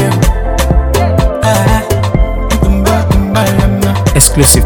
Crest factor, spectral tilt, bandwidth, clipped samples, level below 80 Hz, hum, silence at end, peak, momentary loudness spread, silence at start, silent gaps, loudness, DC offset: 8 dB; -4.5 dB/octave; over 20 kHz; 0.7%; -14 dBFS; none; 0 s; 0 dBFS; 6 LU; 0 s; none; -10 LUFS; under 0.1%